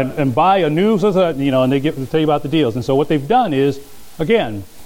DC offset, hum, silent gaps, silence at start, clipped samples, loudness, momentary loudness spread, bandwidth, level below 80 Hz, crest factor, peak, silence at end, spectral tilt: under 0.1%; none; none; 0 s; under 0.1%; -16 LUFS; 5 LU; 17 kHz; -44 dBFS; 14 dB; -2 dBFS; 0 s; -7 dB/octave